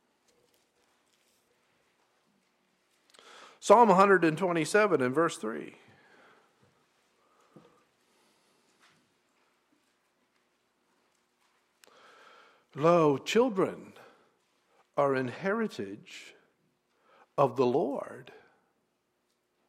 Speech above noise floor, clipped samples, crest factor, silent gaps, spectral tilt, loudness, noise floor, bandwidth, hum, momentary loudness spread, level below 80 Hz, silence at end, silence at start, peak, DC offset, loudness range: 51 dB; under 0.1%; 24 dB; none; -5.5 dB/octave; -27 LUFS; -77 dBFS; 14.5 kHz; none; 24 LU; -80 dBFS; 1.45 s; 3.65 s; -8 dBFS; under 0.1%; 9 LU